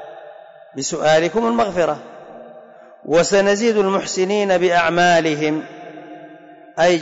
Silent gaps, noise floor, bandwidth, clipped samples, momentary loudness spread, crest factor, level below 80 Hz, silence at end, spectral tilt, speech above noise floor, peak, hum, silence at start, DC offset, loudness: none; -42 dBFS; 8 kHz; under 0.1%; 23 LU; 12 dB; -54 dBFS; 0 s; -4 dB/octave; 26 dB; -6 dBFS; none; 0 s; under 0.1%; -17 LUFS